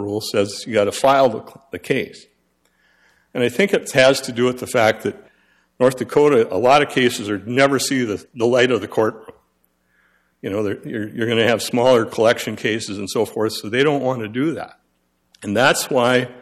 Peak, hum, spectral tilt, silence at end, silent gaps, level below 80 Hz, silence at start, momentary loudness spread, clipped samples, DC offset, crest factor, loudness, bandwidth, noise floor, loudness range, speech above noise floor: -4 dBFS; none; -4.5 dB/octave; 0 s; none; -60 dBFS; 0 s; 11 LU; under 0.1%; under 0.1%; 16 dB; -18 LUFS; 15 kHz; -66 dBFS; 5 LU; 48 dB